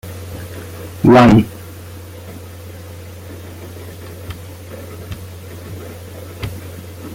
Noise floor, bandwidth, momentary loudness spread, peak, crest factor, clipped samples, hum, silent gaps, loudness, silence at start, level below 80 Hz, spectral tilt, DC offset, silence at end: -33 dBFS; 17 kHz; 23 LU; 0 dBFS; 18 dB; under 0.1%; none; none; -12 LUFS; 0.05 s; -42 dBFS; -7 dB/octave; under 0.1%; 0 s